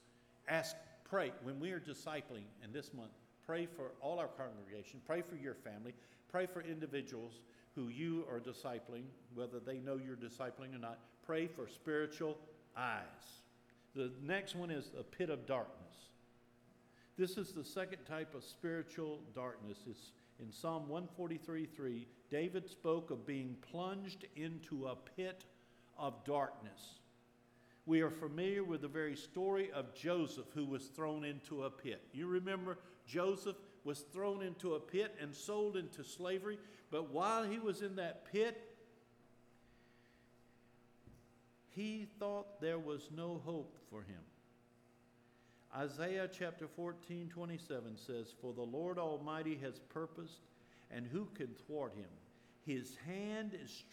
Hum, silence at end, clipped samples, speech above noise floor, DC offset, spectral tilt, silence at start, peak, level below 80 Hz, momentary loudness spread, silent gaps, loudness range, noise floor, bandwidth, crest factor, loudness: none; 0 s; under 0.1%; 26 dB; under 0.1%; -5.5 dB/octave; 0.45 s; -22 dBFS; -84 dBFS; 14 LU; none; 6 LU; -70 dBFS; 17.5 kHz; 22 dB; -45 LUFS